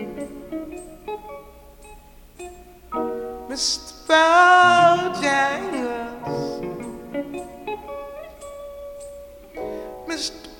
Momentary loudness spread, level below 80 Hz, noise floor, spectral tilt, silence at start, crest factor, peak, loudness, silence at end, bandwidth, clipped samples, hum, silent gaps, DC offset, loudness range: 25 LU; -50 dBFS; -45 dBFS; -3 dB/octave; 0 s; 20 dB; -2 dBFS; -20 LUFS; 0 s; 19 kHz; under 0.1%; none; none; under 0.1%; 16 LU